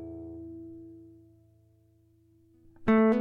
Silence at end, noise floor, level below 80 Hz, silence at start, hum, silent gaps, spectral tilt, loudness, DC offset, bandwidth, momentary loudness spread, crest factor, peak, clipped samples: 0 s; -64 dBFS; -58 dBFS; 0 s; none; none; -9 dB/octave; -29 LUFS; under 0.1%; 4.3 kHz; 26 LU; 20 dB; -12 dBFS; under 0.1%